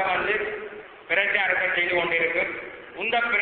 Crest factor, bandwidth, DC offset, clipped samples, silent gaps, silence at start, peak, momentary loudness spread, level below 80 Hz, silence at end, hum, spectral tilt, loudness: 18 dB; 4.6 kHz; under 0.1%; under 0.1%; none; 0 s; -8 dBFS; 14 LU; -58 dBFS; 0 s; none; -7.5 dB/octave; -23 LUFS